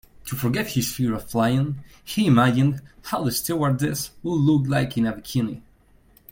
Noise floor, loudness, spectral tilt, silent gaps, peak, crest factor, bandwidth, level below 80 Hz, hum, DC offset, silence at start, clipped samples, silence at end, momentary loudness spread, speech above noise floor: -56 dBFS; -23 LUFS; -6 dB/octave; none; -4 dBFS; 18 dB; 17 kHz; -50 dBFS; none; under 0.1%; 0.25 s; under 0.1%; 0.7 s; 11 LU; 33 dB